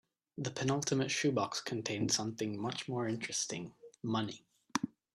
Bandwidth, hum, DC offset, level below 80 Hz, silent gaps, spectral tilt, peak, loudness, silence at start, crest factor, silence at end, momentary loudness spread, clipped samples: 14.5 kHz; none; under 0.1%; -74 dBFS; none; -4 dB/octave; -12 dBFS; -36 LUFS; 0.35 s; 26 dB; 0.3 s; 11 LU; under 0.1%